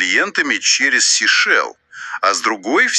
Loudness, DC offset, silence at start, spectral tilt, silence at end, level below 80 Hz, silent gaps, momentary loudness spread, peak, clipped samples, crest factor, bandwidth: -14 LUFS; under 0.1%; 0 s; 1 dB/octave; 0 s; -72 dBFS; none; 11 LU; -2 dBFS; under 0.1%; 14 dB; 12.5 kHz